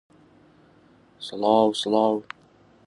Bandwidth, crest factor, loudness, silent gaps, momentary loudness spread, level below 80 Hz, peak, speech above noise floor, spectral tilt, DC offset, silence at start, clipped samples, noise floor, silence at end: 11.5 kHz; 20 dB; -22 LUFS; none; 22 LU; -70 dBFS; -6 dBFS; 34 dB; -5 dB/octave; under 0.1%; 1.2 s; under 0.1%; -56 dBFS; 0.65 s